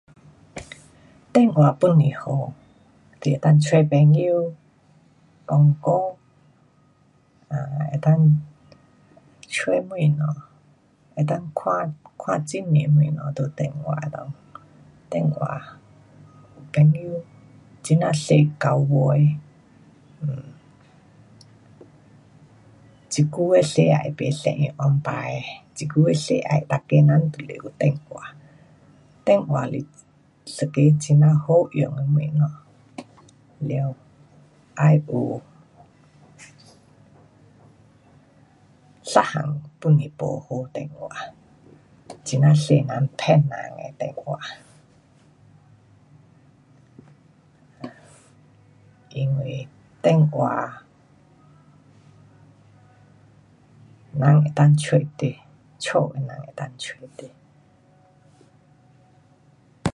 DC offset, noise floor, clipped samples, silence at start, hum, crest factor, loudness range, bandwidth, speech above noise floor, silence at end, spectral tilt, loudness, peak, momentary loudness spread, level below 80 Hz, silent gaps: under 0.1%; -58 dBFS; under 0.1%; 0.55 s; none; 22 dB; 10 LU; 11 kHz; 39 dB; 0.05 s; -7.5 dB/octave; -21 LUFS; 0 dBFS; 19 LU; -60 dBFS; none